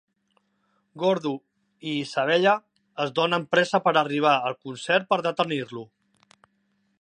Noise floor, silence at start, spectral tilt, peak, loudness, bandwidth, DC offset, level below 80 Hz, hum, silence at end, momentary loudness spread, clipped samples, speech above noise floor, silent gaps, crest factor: -70 dBFS; 0.95 s; -5 dB/octave; -6 dBFS; -24 LUFS; 10 kHz; under 0.1%; -78 dBFS; none; 1.15 s; 14 LU; under 0.1%; 47 dB; none; 20 dB